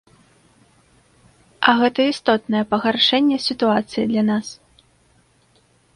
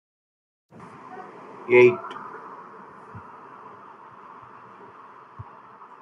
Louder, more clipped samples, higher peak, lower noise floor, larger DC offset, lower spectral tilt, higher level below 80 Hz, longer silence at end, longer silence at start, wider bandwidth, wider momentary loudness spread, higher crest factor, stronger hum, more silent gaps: about the same, -18 LUFS vs -19 LUFS; neither; first, 0 dBFS vs -6 dBFS; first, -58 dBFS vs -47 dBFS; neither; second, -4.5 dB/octave vs -7.5 dB/octave; first, -60 dBFS vs -70 dBFS; first, 1.45 s vs 0.6 s; first, 1.6 s vs 1.15 s; first, 11 kHz vs 6.2 kHz; second, 6 LU vs 28 LU; about the same, 20 dB vs 22 dB; neither; neither